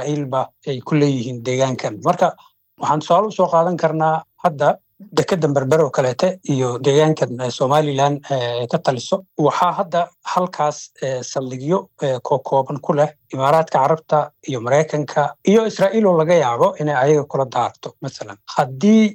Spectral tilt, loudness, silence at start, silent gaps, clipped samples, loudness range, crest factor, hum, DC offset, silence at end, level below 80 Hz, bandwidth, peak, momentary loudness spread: -6 dB/octave; -18 LUFS; 0 s; none; under 0.1%; 4 LU; 14 dB; none; under 0.1%; 0 s; -68 dBFS; 16 kHz; -4 dBFS; 8 LU